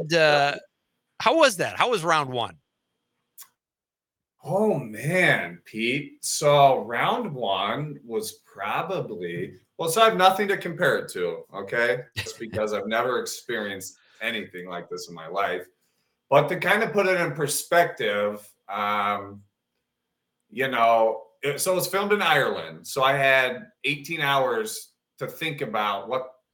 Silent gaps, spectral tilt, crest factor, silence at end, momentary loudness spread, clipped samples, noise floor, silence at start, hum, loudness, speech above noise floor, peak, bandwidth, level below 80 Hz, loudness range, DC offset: none; -3.5 dB/octave; 22 dB; 0.2 s; 15 LU; under 0.1%; under -90 dBFS; 0 s; none; -24 LUFS; over 66 dB; -4 dBFS; 19.5 kHz; -72 dBFS; 5 LU; under 0.1%